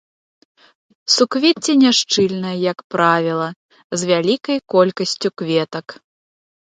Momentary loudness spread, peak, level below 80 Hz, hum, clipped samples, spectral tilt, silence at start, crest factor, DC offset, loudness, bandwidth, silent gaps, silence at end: 13 LU; 0 dBFS; -66 dBFS; none; under 0.1%; -4 dB/octave; 1.05 s; 18 dB; under 0.1%; -17 LUFS; 9.4 kHz; 2.84-2.90 s, 3.56-3.69 s, 3.84-3.90 s; 0.8 s